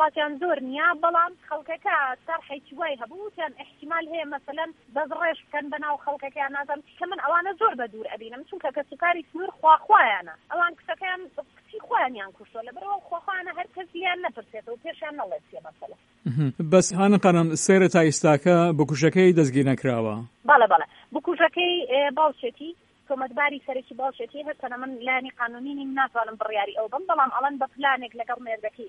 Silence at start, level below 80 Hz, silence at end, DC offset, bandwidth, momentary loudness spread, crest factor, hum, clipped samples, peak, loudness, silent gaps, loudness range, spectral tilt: 0 s; -68 dBFS; 0 s; under 0.1%; 11.5 kHz; 17 LU; 22 dB; none; under 0.1%; -4 dBFS; -24 LUFS; none; 11 LU; -5 dB/octave